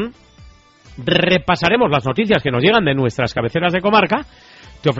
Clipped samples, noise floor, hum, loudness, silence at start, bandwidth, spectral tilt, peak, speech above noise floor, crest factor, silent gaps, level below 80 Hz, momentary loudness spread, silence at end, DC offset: under 0.1%; -45 dBFS; none; -16 LUFS; 0 s; 8 kHz; -3.5 dB/octave; 0 dBFS; 28 dB; 16 dB; none; -44 dBFS; 7 LU; 0 s; under 0.1%